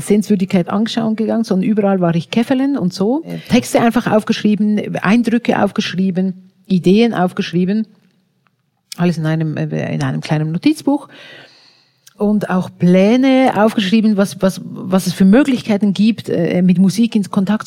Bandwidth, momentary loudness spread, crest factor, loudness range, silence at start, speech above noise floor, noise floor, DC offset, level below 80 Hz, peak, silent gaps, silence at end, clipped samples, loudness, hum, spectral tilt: 15.5 kHz; 8 LU; 14 dB; 6 LU; 0 s; 48 dB; -62 dBFS; under 0.1%; -52 dBFS; -2 dBFS; none; 0 s; under 0.1%; -15 LUFS; none; -6.5 dB/octave